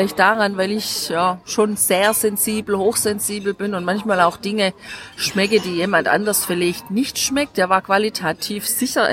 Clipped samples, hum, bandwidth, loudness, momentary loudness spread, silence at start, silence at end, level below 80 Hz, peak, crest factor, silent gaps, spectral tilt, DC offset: under 0.1%; none; 16.5 kHz; -18 LUFS; 7 LU; 0 s; 0 s; -56 dBFS; -2 dBFS; 18 dB; none; -3 dB/octave; under 0.1%